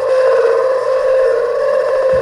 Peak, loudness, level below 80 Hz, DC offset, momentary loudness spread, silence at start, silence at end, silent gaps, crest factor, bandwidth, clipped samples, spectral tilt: -4 dBFS; -13 LUFS; -48 dBFS; under 0.1%; 3 LU; 0 s; 0 s; none; 10 dB; 11 kHz; under 0.1%; -4 dB/octave